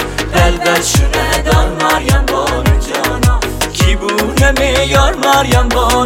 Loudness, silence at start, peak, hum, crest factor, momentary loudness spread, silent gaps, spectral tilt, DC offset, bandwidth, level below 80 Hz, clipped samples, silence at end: -12 LUFS; 0 s; 0 dBFS; none; 12 dB; 4 LU; none; -4 dB/octave; under 0.1%; 17 kHz; -16 dBFS; under 0.1%; 0 s